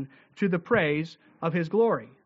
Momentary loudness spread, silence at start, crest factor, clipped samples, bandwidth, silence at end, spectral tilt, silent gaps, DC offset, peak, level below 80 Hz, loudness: 10 LU; 0 s; 18 dB; under 0.1%; 7.6 kHz; 0.2 s; -5.5 dB/octave; none; under 0.1%; -10 dBFS; -66 dBFS; -26 LUFS